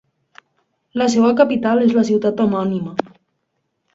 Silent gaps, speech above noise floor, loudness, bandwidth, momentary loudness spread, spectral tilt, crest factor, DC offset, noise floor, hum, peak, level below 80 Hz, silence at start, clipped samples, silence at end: none; 56 dB; -17 LUFS; 7.8 kHz; 11 LU; -6 dB/octave; 18 dB; under 0.1%; -72 dBFS; none; 0 dBFS; -60 dBFS; 0.95 s; under 0.1%; 0.95 s